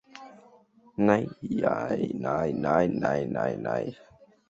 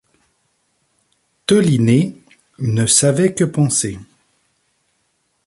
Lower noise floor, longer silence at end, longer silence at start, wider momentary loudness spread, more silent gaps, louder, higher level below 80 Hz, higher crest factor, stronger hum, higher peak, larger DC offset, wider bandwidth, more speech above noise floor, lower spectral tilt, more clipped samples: second, -58 dBFS vs -66 dBFS; second, 0.55 s vs 1.45 s; second, 0.15 s vs 1.5 s; about the same, 12 LU vs 13 LU; neither; second, -28 LUFS vs -16 LUFS; second, -60 dBFS vs -52 dBFS; about the same, 22 dB vs 18 dB; neither; second, -6 dBFS vs 0 dBFS; neither; second, 7.8 kHz vs 11.5 kHz; second, 31 dB vs 51 dB; first, -8 dB/octave vs -5 dB/octave; neither